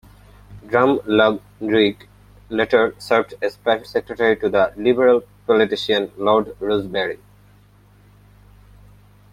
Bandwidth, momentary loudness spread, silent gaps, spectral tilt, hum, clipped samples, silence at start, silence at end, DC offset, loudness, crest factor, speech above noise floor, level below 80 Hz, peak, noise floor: 14.5 kHz; 8 LU; none; -6 dB/octave; 50 Hz at -45 dBFS; under 0.1%; 0.5 s; 2.15 s; under 0.1%; -19 LUFS; 18 dB; 33 dB; -52 dBFS; -2 dBFS; -51 dBFS